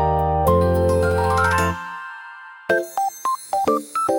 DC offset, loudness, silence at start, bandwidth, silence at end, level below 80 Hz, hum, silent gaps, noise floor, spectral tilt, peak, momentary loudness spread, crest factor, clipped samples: under 0.1%; -20 LUFS; 0 s; 17.5 kHz; 0 s; -40 dBFS; none; none; -39 dBFS; -6 dB/octave; -6 dBFS; 16 LU; 14 dB; under 0.1%